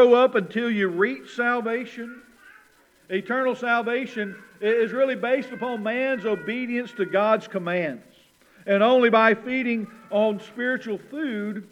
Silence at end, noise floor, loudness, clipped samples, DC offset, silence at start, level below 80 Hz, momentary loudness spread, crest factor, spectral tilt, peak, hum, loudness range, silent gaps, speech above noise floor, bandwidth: 0.1 s; -58 dBFS; -24 LUFS; under 0.1%; under 0.1%; 0 s; -76 dBFS; 12 LU; 20 dB; -6.5 dB/octave; -4 dBFS; none; 5 LU; none; 35 dB; 10.5 kHz